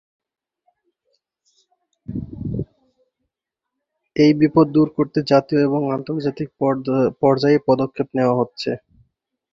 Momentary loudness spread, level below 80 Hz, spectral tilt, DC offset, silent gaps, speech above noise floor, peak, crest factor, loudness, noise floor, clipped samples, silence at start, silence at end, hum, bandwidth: 14 LU; -50 dBFS; -8 dB/octave; under 0.1%; none; 65 dB; -2 dBFS; 18 dB; -19 LUFS; -83 dBFS; under 0.1%; 2.1 s; 0.75 s; none; 7.4 kHz